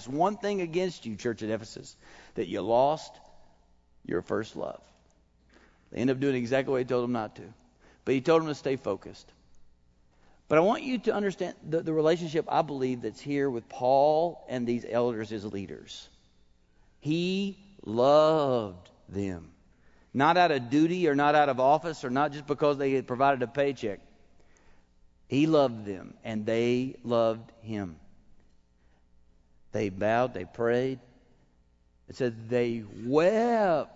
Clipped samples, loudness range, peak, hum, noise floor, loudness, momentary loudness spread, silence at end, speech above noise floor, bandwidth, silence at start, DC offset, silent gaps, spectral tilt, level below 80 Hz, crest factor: under 0.1%; 7 LU; -8 dBFS; none; -64 dBFS; -28 LUFS; 16 LU; 0.1 s; 37 dB; 8 kHz; 0 s; under 0.1%; none; -6.5 dB/octave; -62 dBFS; 20 dB